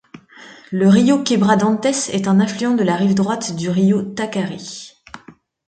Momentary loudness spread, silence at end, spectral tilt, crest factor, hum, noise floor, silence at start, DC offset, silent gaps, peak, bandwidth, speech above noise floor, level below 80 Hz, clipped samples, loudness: 13 LU; 0.35 s; -5.5 dB/octave; 16 dB; none; -46 dBFS; 0.15 s; under 0.1%; none; 0 dBFS; 9.2 kHz; 30 dB; -58 dBFS; under 0.1%; -17 LUFS